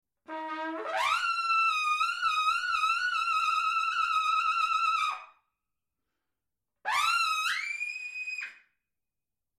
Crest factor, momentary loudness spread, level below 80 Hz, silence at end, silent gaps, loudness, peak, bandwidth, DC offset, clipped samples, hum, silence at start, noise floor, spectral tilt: 14 dB; 10 LU; -72 dBFS; 1.05 s; none; -28 LUFS; -16 dBFS; 15.5 kHz; under 0.1%; under 0.1%; none; 0.3 s; under -90 dBFS; 0.5 dB/octave